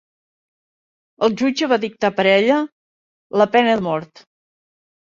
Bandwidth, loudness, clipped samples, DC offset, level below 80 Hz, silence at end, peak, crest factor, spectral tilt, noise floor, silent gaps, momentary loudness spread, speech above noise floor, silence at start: 7.6 kHz; -18 LUFS; under 0.1%; under 0.1%; -64 dBFS; 1 s; -2 dBFS; 18 dB; -5 dB/octave; under -90 dBFS; 2.72-3.30 s; 9 LU; over 73 dB; 1.2 s